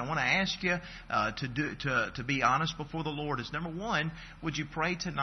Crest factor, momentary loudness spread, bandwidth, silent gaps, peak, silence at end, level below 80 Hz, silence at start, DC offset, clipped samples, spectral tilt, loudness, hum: 20 dB; 9 LU; 6.4 kHz; none; -12 dBFS; 0 s; -52 dBFS; 0 s; under 0.1%; under 0.1%; -4.5 dB/octave; -32 LUFS; none